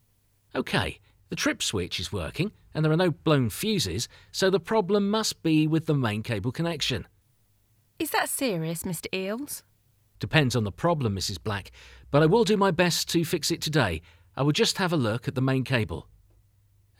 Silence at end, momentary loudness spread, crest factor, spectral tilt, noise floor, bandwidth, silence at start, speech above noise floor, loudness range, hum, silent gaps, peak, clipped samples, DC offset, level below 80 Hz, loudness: 1 s; 11 LU; 20 dB; -5 dB/octave; -66 dBFS; 17 kHz; 0.55 s; 40 dB; 5 LU; none; none; -6 dBFS; under 0.1%; under 0.1%; -52 dBFS; -26 LUFS